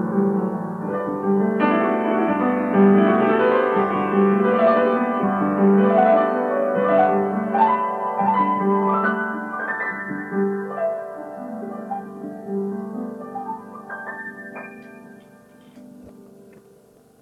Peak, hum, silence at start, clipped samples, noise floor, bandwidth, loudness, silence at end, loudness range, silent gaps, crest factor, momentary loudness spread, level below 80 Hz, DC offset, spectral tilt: -4 dBFS; none; 0 s; under 0.1%; -52 dBFS; 4.5 kHz; -20 LUFS; 1 s; 16 LU; none; 16 dB; 16 LU; -66 dBFS; under 0.1%; -9 dB/octave